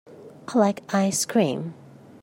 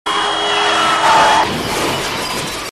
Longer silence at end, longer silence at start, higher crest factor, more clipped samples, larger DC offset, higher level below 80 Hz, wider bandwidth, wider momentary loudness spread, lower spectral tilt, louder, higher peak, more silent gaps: first, 0.5 s vs 0 s; about the same, 0.1 s vs 0.05 s; about the same, 18 dB vs 14 dB; neither; second, under 0.1% vs 0.3%; second, -70 dBFS vs -42 dBFS; first, 16 kHz vs 14.5 kHz; first, 13 LU vs 9 LU; first, -4.5 dB/octave vs -2 dB/octave; second, -23 LUFS vs -14 LUFS; second, -6 dBFS vs 0 dBFS; neither